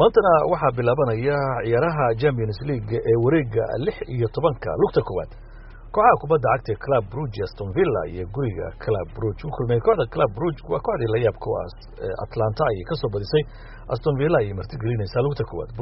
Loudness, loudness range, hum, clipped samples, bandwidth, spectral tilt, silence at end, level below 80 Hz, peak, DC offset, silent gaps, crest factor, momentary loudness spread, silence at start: -23 LUFS; 3 LU; none; under 0.1%; 5.8 kHz; -6.5 dB/octave; 0 s; -40 dBFS; -2 dBFS; under 0.1%; none; 20 dB; 10 LU; 0 s